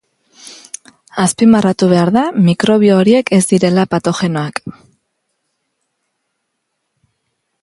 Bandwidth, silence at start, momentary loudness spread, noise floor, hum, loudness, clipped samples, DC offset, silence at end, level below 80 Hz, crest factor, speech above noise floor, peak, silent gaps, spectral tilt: 11.5 kHz; 0.45 s; 21 LU; -71 dBFS; none; -12 LUFS; under 0.1%; under 0.1%; 2.9 s; -54 dBFS; 14 dB; 60 dB; 0 dBFS; none; -6 dB/octave